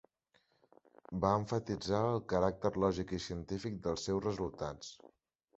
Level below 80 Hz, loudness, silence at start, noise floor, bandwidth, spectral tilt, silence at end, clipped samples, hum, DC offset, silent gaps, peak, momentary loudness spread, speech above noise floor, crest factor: -56 dBFS; -36 LUFS; 1.1 s; -75 dBFS; 8 kHz; -6 dB/octave; 0.65 s; under 0.1%; none; under 0.1%; none; -14 dBFS; 10 LU; 40 dB; 22 dB